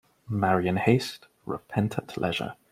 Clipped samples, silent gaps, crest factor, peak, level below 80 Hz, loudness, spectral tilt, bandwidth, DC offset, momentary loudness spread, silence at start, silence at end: under 0.1%; none; 20 dB; -6 dBFS; -60 dBFS; -27 LUFS; -6.5 dB/octave; 16 kHz; under 0.1%; 13 LU; 0.3 s; 0.2 s